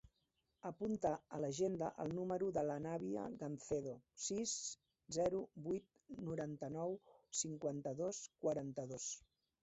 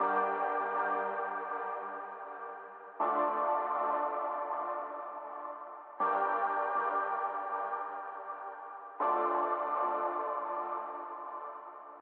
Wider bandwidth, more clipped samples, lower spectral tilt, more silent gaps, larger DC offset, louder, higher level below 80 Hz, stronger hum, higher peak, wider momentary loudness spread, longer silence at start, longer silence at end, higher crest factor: first, 8.2 kHz vs 4.3 kHz; neither; first, -5 dB/octave vs -2 dB/octave; neither; neither; second, -44 LUFS vs -34 LUFS; first, -74 dBFS vs under -90 dBFS; neither; second, -26 dBFS vs -18 dBFS; second, 8 LU vs 13 LU; about the same, 0.05 s vs 0 s; first, 0.45 s vs 0 s; about the same, 18 dB vs 16 dB